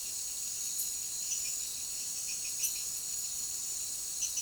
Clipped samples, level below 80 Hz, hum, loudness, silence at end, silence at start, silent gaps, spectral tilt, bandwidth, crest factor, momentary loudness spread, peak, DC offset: under 0.1%; -66 dBFS; none; -34 LUFS; 0 s; 0 s; none; 2 dB/octave; over 20 kHz; 20 dB; 3 LU; -18 dBFS; under 0.1%